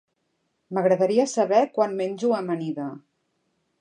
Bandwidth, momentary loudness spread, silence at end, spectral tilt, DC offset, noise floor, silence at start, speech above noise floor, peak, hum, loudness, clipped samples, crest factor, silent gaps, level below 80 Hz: 10 kHz; 10 LU; 0.85 s; -5.5 dB/octave; under 0.1%; -74 dBFS; 0.7 s; 51 dB; -6 dBFS; none; -23 LUFS; under 0.1%; 18 dB; none; -80 dBFS